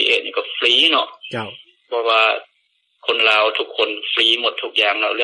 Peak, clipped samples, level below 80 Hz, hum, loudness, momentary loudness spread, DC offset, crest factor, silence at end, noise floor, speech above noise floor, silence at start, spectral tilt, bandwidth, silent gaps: -2 dBFS; under 0.1%; -72 dBFS; none; -16 LUFS; 13 LU; under 0.1%; 18 dB; 0 s; -65 dBFS; 47 dB; 0 s; -2.5 dB/octave; 11 kHz; none